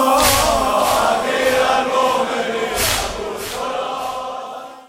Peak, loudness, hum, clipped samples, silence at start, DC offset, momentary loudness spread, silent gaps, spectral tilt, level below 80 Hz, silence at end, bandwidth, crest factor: -2 dBFS; -17 LUFS; none; under 0.1%; 0 s; under 0.1%; 12 LU; none; -2 dB/octave; -38 dBFS; 0.05 s; 17 kHz; 16 dB